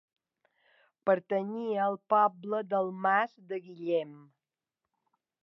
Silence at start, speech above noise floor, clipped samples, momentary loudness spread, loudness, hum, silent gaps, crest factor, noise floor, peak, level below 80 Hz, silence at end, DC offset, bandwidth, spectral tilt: 1.05 s; 59 dB; under 0.1%; 11 LU; -30 LUFS; none; none; 20 dB; -89 dBFS; -12 dBFS; under -90 dBFS; 1.25 s; under 0.1%; 6 kHz; -8 dB/octave